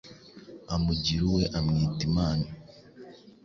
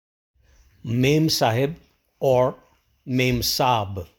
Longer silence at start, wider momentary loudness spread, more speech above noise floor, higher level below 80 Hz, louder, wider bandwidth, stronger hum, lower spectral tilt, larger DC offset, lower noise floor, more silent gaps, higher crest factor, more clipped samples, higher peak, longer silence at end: second, 0.05 s vs 0.85 s; first, 23 LU vs 9 LU; second, 23 dB vs 35 dB; first, -42 dBFS vs -48 dBFS; second, -28 LUFS vs -21 LUFS; second, 7.2 kHz vs over 20 kHz; neither; first, -6.5 dB/octave vs -5 dB/octave; neither; second, -49 dBFS vs -56 dBFS; neither; about the same, 16 dB vs 18 dB; neither; second, -14 dBFS vs -6 dBFS; about the same, 0.15 s vs 0.15 s